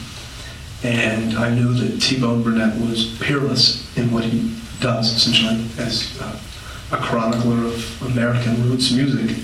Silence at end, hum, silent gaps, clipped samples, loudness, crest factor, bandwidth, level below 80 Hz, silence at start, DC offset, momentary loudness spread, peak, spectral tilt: 0 s; none; none; under 0.1%; -19 LUFS; 18 dB; 14.5 kHz; -42 dBFS; 0 s; under 0.1%; 15 LU; -2 dBFS; -5 dB/octave